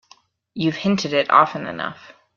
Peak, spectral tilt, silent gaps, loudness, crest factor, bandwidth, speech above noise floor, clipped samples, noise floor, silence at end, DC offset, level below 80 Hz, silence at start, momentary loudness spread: 0 dBFS; -5.5 dB/octave; none; -20 LUFS; 20 dB; 7.2 kHz; 35 dB; under 0.1%; -55 dBFS; 0.25 s; under 0.1%; -62 dBFS; 0.55 s; 14 LU